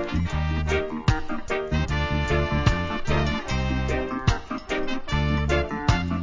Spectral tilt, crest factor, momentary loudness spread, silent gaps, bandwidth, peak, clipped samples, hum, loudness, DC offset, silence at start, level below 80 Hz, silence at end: -6 dB/octave; 20 dB; 5 LU; none; 7.6 kHz; -4 dBFS; under 0.1%; none; -25 LUFS; under 0.1%; 0 s; -30 dBFS; 0 s